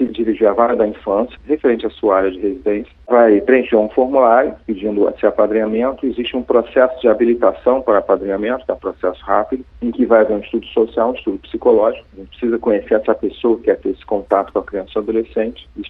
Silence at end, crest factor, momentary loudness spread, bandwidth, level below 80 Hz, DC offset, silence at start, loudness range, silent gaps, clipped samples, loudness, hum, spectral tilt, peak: 0 s; 16 dB; 9 LU; 4.6 kHz; -44 dBFS; under 0.1%; 0 s; 3 LU; none; under 0.1%; -16 LUFS; none; -8.5 dB/octave; 0 dBFS